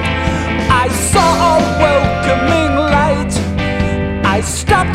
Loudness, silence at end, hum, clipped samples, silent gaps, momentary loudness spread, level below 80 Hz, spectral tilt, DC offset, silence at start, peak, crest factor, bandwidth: -13 LUFS; 0 s; none; under 0.1%; none; 5 LU; -24 dBFS; -5 dB/octave; under 0.1%; 0 s; 0 dBFS; 12 dB; 15.5 kHz